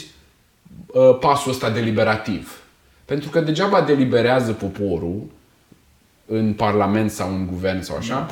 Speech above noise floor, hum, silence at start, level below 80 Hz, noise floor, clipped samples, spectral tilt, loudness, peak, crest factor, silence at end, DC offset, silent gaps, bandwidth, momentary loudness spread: 37 dB; none; 0 s; -50 dBFS; -56 dBFS; under 0.1%; -6 dB/octave; -20 LUFS; -2 dBFS; 18 dB; 0 s; under 0.1%; none; 17 kHz; 11 LU